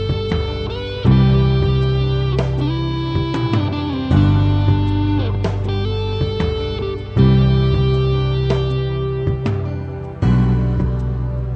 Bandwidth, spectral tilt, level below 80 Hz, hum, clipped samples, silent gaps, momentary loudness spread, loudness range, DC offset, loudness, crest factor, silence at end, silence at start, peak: 6.2 kHz; -9 dB/octave; -26 dBFS; none; under 0.1%; none; 8 LU; 1 LU; under 0.1%; -18 LUFS; 14 dB; 0 s; 0 s; -2 dBFS